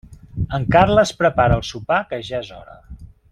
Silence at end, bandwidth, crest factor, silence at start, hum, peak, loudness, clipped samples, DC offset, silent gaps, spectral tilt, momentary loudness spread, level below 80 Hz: 0.25 s; 12 kHz; 18 dB; 0.1 s; none; -2 dBFS; -18 LUFS; under 0.1%; under 0.1%; none; -6 dB/octave; 14 LU; -36 dBFS